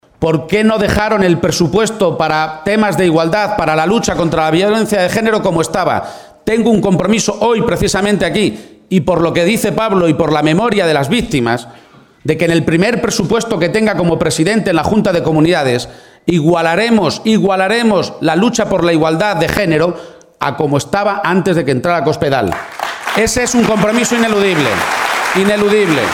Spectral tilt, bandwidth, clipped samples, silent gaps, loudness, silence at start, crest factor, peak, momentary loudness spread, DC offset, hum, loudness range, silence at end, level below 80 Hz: -5 dB/octave; 18 kHz; under 0.1%; none; -13 LUFS; 0.2 s; 12 dB; 0 dBFS; 5 LU; under 0.1%; none; 2 LU; 0 s; -38 dBFS